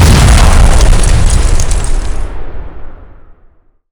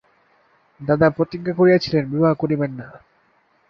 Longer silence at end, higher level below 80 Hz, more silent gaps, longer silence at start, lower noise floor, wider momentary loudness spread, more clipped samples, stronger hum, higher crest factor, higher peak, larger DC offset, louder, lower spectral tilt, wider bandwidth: about the same, 0.7 s vs 0.7 s; first, -8 dBFS vs -54 dBFS; neither; second, 0 s vs 0.8 s; second, -44 dBFS vs -61 dBFS; first, 21 LU vs 11 LU; first, 4% vs under 0.1%; neither; second, 8 dB vs 18 dB; about the same, 0 dBFS vs -2 dBFS; neither; first, -10 LUFS vs -19 LUFS; second, -4.5 dB/octave vs -8 dB/octave; first, 18 kHz vs 6.6 kHz